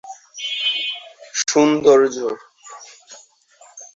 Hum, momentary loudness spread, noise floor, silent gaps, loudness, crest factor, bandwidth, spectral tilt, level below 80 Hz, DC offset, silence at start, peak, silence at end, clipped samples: none; 25 LU; -51 dBFS; none; -18 LUFS; 18 dB; 8 kHz; -2.5 dB/octave; -62 dBFS; under 0.1%; 0.05 s; -2 dBFS; 0.1 s; under 0.1%